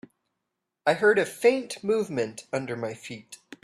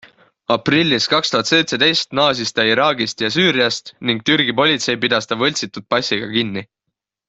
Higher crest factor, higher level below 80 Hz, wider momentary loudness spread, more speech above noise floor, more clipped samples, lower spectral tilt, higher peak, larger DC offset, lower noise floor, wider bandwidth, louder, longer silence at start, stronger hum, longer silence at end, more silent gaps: about the same, 20 dB vs 16 dB; second, -72 dBFS vs -58 dBFS; first, 18 LU vs 6 LU; second, 57 dB vs 61 dB; neither; about the same, -4.5 dB/octave vs -3.5 dB/octave; second, -8 dBFS vs -2 dBFS; neither; first, -83 dBFS vs -78 dBFS; first, 14 kHz vs 8.2 kHz; second, -26 LUFS vs -16 LUFS; first, 0.85 s vs 0.5 s; neither; second, 0.3 s vs 0.65 s; neither